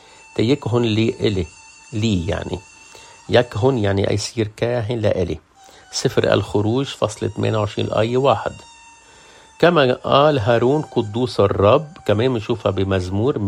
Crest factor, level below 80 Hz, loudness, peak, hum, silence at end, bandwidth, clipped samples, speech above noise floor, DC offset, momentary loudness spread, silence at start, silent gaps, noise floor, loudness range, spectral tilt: 18 dB; -48 dBFS; -19 LUFS; 0 dBFS; none; 0 s; 11.5 kHz; under 0.1%; 28 dB; under 0.1%; 11 LU; 0.35 s; none; -46 dBFS; 4 LU; -6 dB/octave